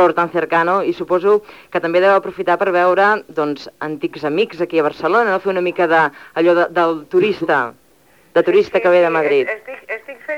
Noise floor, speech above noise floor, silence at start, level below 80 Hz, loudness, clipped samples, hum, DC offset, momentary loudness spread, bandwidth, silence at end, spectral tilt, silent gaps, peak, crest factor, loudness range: -52 dBFS; 36 dB; 0 s; -62 dBFS; -16 LUFS; under 0.1%; none; 0.1%; 10 LU; 11 kHz; 0 s; -6.5 dB/octave; none; -2 dBFS; 14 dB; 2 LU